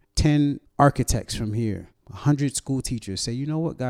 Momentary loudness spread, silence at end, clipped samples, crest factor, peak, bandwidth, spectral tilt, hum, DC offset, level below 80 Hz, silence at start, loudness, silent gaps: 9 LU; 0 s; under 0.1%; 20 dB; -4 dBFS; 14.5 kHz; -5.5 dB/octave; none; under 0.1%; -36 dBFS; 0.15 s; -24 LUFS; none